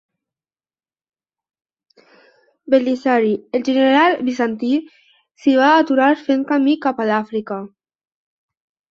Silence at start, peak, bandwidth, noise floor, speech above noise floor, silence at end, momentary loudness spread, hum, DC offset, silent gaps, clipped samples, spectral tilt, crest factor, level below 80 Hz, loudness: 2.7 s; -2 dBFS; 7.2 kHz; under -90 dBFS; over 74 dB; 1.25 s; 9 LU; none; under 0.1%; none; under 0.1%; -5.5 dB/octave; 18 dB; -66 dBFS; -17 LUFS